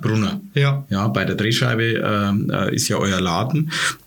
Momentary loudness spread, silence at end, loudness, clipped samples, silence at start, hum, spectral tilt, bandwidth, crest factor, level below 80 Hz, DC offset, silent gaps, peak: 3 LU; 0.1 s; -20 LUFS; under 0.1%; 0 s; none; -5 dB/octave; 19 kHz; 18 dB; -54 dBFS; under 0.1%; none; -2 dBFS